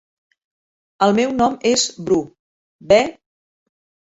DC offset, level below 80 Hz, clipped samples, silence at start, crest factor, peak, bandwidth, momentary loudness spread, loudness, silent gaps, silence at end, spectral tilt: under 0.1%; -54 dBFS; under 0.1%; 1 s; 20 dB; -2 dBFS; 8 kHz; 5 LU; -17 LUFS; 2.39-2.79 s; 1.05 s; -3.5 dB/octave